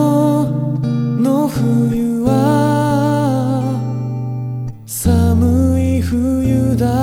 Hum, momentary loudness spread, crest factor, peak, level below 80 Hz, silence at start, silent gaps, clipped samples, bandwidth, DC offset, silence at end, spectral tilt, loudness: none; 8 LU; 12 dB; -2 dBFS; -32 dBFS; 0 s; none; under 0.1%; 16.5 kHz; under 0.1%; 0 s; -7.5 dB/octave; -16 LUFS